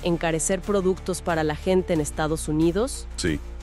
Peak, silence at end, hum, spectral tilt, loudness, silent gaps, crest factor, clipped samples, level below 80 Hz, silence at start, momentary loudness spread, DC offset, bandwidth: -10 dBFS; 0 s; none; -5 dB/octave; -24 LUFS; none; 16 dB; under 0.1%; -36 dBFS; 0 s; 5 LU; under 0.1%; 14.5 kHz